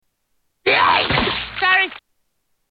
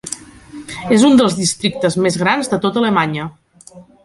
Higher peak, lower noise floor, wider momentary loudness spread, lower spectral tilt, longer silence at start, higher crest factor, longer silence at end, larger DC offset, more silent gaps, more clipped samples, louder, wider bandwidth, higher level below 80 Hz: about the same, -2 dBFS vs 0 dBFS; first, -70 dBFS vs -42 dBFS; second, 8 LU vs 18 LU; first, -7 dB/octave vs -4.5 dB/octave; first, 0.65 s vs 0.05 s; about the same, 18 dB vs 16 dB; first, 0.75 s vs 0.25 s; neither; neither; neither; about the same, -17 LUFS vs -15 LUFS; second, 5.2 kHz vs 11.5 kHz; first, -42 dBFS vs -52 dBFS